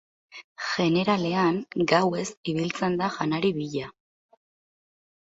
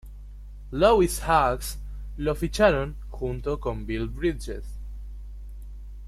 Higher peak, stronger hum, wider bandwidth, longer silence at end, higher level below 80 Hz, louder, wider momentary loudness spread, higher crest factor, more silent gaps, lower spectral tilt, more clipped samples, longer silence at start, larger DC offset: about the same, -6 dBFS vs -6 dBFS; second, none vs 50 Hz at -35 dBFS; second, 8 kHz vs 15 kHz; first, 1.3 s vs 0 s; second, -64 dBFS vs -36 dBFS; about the same, -26 LUFS vs -25 LUFS; second, 13 LU vs 22 LU; about the same, 22 dB vs 20 dB; first, 0.44-0.55 s, 2.37-2.43 s vs none; about the same, -5.5 dB/octave vs -5.5 dB/octave; neither; first, 0.35 s vs 0.05 s; neither